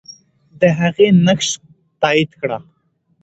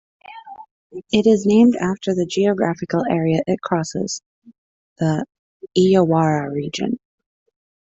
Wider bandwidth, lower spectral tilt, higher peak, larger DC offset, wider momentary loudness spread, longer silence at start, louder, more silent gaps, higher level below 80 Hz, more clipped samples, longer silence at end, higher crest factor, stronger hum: about the same, 8.2 kHz vs 8.2 kHz; about the same, -5 dB/octave vs -6 dB/octave; first, 0 dBFS vs -4 dBFS; neither; second, 12 LU vs 16 LU; second, 0.1 s vs 0.3 s; first, -15 LUFS vs -19 LUFS; second, none vs 0.71-0.90 s, 4.26-4.42 s, 4.58-4.96 s, 5.39-5.60 s; about the same, -56 dBFS vs -58 dBFS; neither; second, 0.65 s vs 0.9 s; about the same, 16 dB vs 16 dB; neither